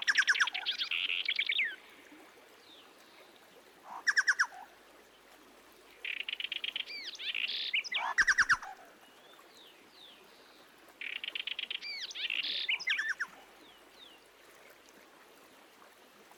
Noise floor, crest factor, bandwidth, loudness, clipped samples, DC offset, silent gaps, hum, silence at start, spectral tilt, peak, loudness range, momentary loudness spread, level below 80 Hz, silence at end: -59 dBFS; 22 dB; 19 kHz; -32 LUFS; under 0.1%; under 0.1%; none; none; 0 s; 1.5 dB/octave; -16 dBFS; 7 LU; 26 LU; -72 dBFS; 0.55 s